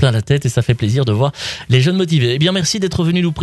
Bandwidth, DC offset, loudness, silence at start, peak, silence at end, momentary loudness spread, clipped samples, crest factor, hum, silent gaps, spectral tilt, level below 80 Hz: 12.5 kHz; under 0.1%; -15 LUFS; 0 s; -2 dBFS; 0 s; 3 LU; under 0.1%; 12 dB; none; none; -5.5 dB/octave; -42 dBFS